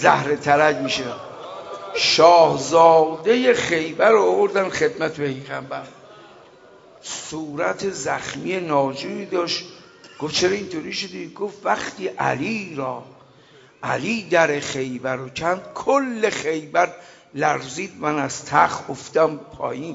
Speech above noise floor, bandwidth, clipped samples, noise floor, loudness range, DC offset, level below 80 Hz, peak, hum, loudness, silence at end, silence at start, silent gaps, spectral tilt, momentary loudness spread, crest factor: 30 dB; 8 kHz; under 0.1%; -50 dBFS; 10 LU; under 0.1%; -60 dBFS; 0 dBFS; none; -20 LUFS; 0 s; 0 s; none; -4 dB/octave; 15 LU; 20 dB